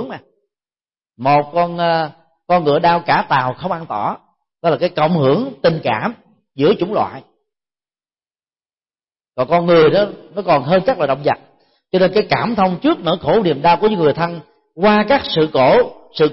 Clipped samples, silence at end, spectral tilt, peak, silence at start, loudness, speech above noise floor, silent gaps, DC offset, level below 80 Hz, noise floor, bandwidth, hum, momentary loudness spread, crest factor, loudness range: under 0.1%; 0 s; -10 dB/octave; -4 dBFS; 0 s; -16 LUFS; over 75 dB; none; under 0.1%; -50 dBFS; under -90 dBFS; 5.8 kHz; none; 10 LU; 14 dB; 5 LU